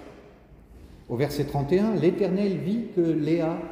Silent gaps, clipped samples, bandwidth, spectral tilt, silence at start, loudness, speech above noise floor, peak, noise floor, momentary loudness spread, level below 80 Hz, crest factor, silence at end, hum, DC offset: none; under 0.1%; 16 kHz; -8 dB/octave; 0 s; -25 LUFS; 26 dB; -10 dBFS; -50 dBFS; 5 LU; -52 dBFS; 16 dB; 0 s; none; under 0.1%